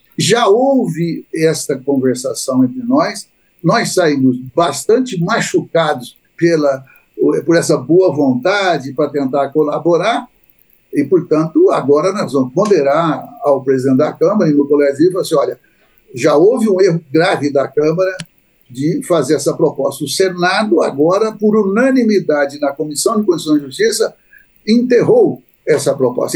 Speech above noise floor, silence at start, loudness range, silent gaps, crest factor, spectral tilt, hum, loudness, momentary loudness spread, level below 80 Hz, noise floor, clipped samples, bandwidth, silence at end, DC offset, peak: 39 dB; 0.2 s; 2 LU; none; 12 dB; -5 dB/octave; none; -14 LUFS; 7 LU; -62 dBFS; -52 dBFS; under 0.1%; over 20 kHz; 0 s; under 0.1%; -2 dBFS